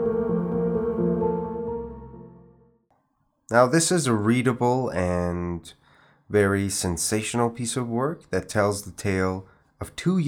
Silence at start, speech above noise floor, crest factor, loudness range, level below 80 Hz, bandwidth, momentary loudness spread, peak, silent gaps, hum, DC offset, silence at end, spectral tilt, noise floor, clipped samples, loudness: 0 s; 47 dB; 20 dB; 3 LU; -52 dBFS; 17.5 kHz; 12 LU; -4 dBFS; none; none; under 0.1%; 0 s; -5 dB/octave; -70 dBFS; under 0.1%; -24 LUFS